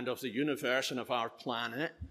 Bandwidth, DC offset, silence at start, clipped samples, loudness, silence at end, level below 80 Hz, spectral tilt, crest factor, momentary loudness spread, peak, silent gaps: 14.5 kHz; under 0.1%; 0 s; under 0.1%; -35 LUFS; 0 s; -60 dBFS; -4 dB/octave; 18 dB; 5 LU; -18 dBFS; none